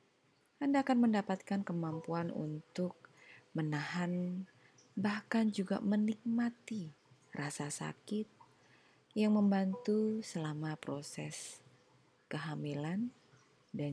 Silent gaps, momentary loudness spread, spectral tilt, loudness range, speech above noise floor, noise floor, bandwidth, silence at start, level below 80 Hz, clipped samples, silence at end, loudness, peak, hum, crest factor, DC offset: none; 13 LU; -6 dB/octave; 5 LU; 37 dB; -73 dBFS; 12 kHz; 0.6 s; -84 dBFS; under 0.1%; 0 s; -37 LUFS; -22 dBFS; none; 16 dB; under 0.1%